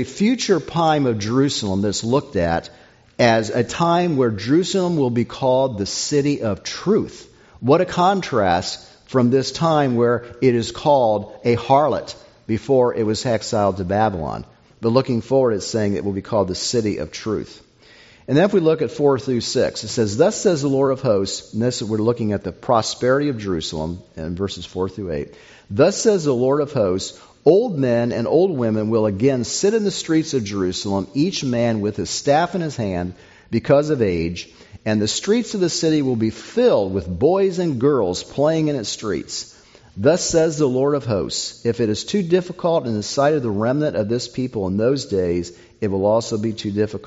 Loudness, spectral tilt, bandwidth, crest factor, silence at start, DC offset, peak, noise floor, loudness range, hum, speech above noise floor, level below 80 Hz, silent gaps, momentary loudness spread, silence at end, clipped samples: -20 LUFS; -5.5 dB/octave; 8 kHz; 18 dB; 0 s; under 0.1%; -2 dBFS; -48 dBFS; 3 LU; none; 29 dB; -52 dBFS; none; 9 LU; 0 s; under 0.1%